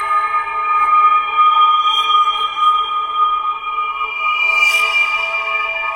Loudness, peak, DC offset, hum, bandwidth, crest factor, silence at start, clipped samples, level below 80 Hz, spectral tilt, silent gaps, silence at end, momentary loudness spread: -14 LUFS; -2 dBFS; under 0.1%; none; 16 kHz; 12 dB; 0 s; under 0.1%; -54 dBFS; 1.5 dB/octave; none; 0 s; 7 LU